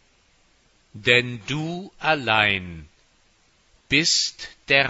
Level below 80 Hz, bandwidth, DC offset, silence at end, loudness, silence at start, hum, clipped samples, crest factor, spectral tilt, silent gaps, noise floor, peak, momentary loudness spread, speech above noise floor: -54 dBFS; 8.2 kHz; under 0.1%; 0 s; -21 LUFS; 0.95 s; none; under 0.1%; 22 dB; -2.5 dB/octave; none; -61 dBFS; -2 dBFS; 14 LU; 38 dB